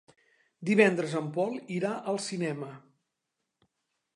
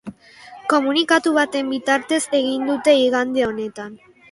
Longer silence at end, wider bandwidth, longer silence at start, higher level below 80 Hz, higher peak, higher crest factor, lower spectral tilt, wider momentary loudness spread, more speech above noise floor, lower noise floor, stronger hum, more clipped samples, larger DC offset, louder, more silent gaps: first, 1.35 s vs 0.35 s; about the same, 11 kHz vs 11.5 kHz; first, 0.6 s vs 0.05 s; second, -82 dBFS vs -60 dBFS; second, -6 dBFS vs -2 dBFS; first, 24 dB vs 18 dB; first, -5.5 dB/octave vs -3 dB/octave; about the same, 14 LU vs 13 LU; first, 55 dB vs 24 dB; first, -84 dBFS vs -43 dBFS; neither; neither; neither; second, -29 LUFS vs -19 LUFS; neither